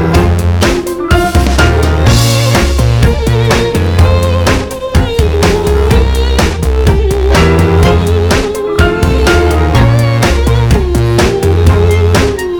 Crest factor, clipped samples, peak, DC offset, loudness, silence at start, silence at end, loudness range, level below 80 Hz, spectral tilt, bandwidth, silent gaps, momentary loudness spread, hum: 8 dB; under 0.1%; 0 dBFS; under 0.1%; -10 LUFS; 0 s; 0 s; 1 LU; -14 dBFS; -6 dB/octave; 19.5 kHz; none; 3 LU; none